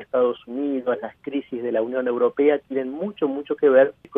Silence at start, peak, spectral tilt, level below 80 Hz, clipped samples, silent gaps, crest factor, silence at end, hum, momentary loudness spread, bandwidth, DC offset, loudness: 0 s; -4 dBFS; -9 dB/octave; -68 dBFS; under 0.1%; none; 18 dB; 0 s; none; 11 LU; 3.8 kHz; under 0.1%; -23 LUFS